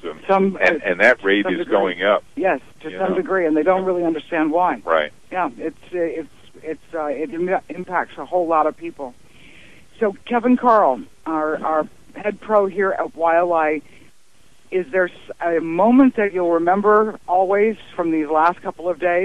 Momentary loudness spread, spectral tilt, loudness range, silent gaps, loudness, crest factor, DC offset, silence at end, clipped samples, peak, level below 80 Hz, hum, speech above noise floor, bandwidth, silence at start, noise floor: 12 LU; -6.5 dB/octave; 6 LU; none; -19 LUFS; 18 dB; 0.6%; 0 s; under 0.1%; -2 dBFS; -58 dBFS; none; 37 dB; 12 kHz; 0.05 s; -56 dBFS